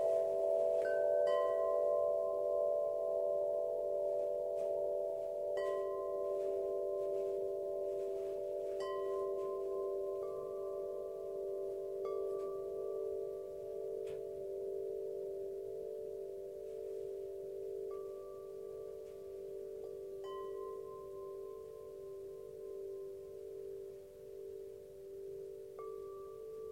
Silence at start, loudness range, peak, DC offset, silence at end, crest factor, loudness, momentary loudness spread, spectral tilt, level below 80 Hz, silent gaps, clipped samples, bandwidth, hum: 0 s; 13 LU; -24 dBFS; under 0.1%; 0 s; 16 dB; -40 LUFS; 15 LU; -6 dB/octave; -74 dBFS; none; under 0.1%; 16 kHz; none